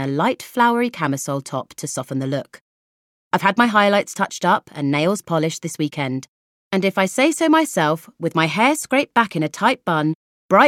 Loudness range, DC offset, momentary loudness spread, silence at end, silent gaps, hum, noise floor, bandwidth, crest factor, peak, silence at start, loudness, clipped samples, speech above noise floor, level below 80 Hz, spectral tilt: 4 LU; under 0.1%; 9 LU; 0 s; 2.61-3.31 s, 6.28-6.71 s, 10.15-10.49 s; none; under -90 dBFS; 17 kHz; 18 dB; -2 dBFS; 0 s; -19 LUFS; under 0.1%; over 71 dB; -68 dBFS; -4.5 dB/octave